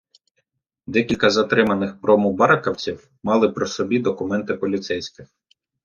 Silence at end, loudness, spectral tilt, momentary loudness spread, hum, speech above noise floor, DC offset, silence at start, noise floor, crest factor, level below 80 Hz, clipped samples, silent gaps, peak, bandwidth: 0.6 s; -20 LUFS; -5.5 dB/octave; 11 LU; none; 53 dB; under 0.1%; 0.9 s; -73 dBFS; 20 dB; -58 dBFS; under 0.1%; none; -2 dBFS; 7.2 kHz